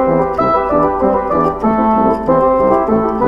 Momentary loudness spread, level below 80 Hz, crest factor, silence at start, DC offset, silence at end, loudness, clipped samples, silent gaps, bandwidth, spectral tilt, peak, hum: 2 LU; -34 dBFS; 12 dB; 0 s; under 0.1%; 0 s; -13 LUFS; under 0.1%; none; 5.8 kHz; -9.5 dB/octave; 0 dBFS; none